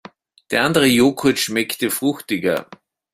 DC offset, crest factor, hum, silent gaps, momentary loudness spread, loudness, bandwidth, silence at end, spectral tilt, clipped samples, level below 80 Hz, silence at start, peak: under 0.1%; 18 dB; none; none; 8 LU; -18 LUFS; 16 kHz; 0.5 s; -4 dB/octave; under 0.1%; -56 dBFS; 0.5 s; -2 dBFS